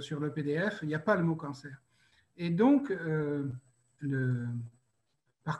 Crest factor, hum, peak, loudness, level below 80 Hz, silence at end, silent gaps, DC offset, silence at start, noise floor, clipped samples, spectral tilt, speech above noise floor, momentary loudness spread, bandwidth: 20 dB; none; -14 dBFS; -32 LUFS; -72 dBFS; 0 s; none; under 0.1%; 0 s; -79 dBFS; under 0.1%; -8 dB/octave; 48 dB; 17 LU; 9.6 kHz